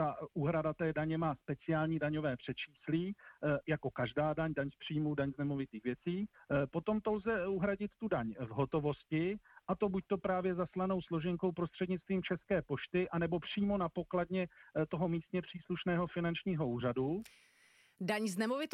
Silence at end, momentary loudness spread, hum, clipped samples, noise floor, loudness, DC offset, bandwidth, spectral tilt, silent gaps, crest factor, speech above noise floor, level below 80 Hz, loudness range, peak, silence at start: 0.05 s; 5 LU; none; under 0.1%; -68 dBFS; -37 LUFS; under 0.1%; 14 kHz; -7.5 dB/octave; none; 14 dB; 32 dB; -62 dBFS; 1 LU; -22 dBFS; 0 s